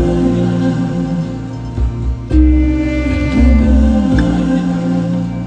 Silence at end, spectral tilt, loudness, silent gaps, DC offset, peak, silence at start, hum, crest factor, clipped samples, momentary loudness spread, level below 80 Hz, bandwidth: 0 s; -8.5 dB/octave; -14 LUFS; none; under 0.1%; 0 dBFS; 0 s; none; 12 dB; under 0.1%; 9 LU; -16 dBFS; 8.4 kHz